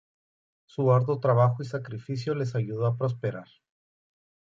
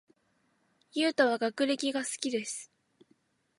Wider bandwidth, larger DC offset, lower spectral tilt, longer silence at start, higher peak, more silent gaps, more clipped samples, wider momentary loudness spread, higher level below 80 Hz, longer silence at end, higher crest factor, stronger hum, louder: second, 7.4 kHz vs 11.5 kHz; neither; first, -8.5 dB/octave vs -2 dB/octave; second, 0.8 s vs 0.95 s; first, -10 dBFS vs -14 dBFS; neither; neither; about the same, 12 LU vs 12 LU; first, -66 dBFS vs -86 dBFS; about the same, 1.05 s vs 0.95 s; about the same, 18 dB vs 20 dB; neither; first, -27 LUFS vs -31 LUFS